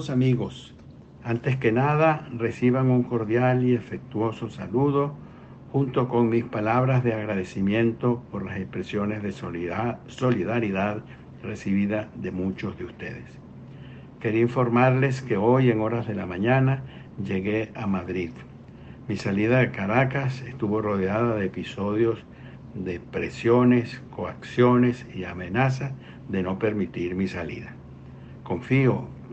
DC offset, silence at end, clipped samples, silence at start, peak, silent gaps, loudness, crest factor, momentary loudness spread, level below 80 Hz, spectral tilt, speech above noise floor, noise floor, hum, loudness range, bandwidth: under 0.1%; 0 s; under 0.1%; 0 s; -6 dBFS; none; -25 LUFS; 18 dB; 19 LU; -54 dBFS; -8.5 dB/octave; 19 dB; -43 dBFS; none; 5 LU; 8 kHz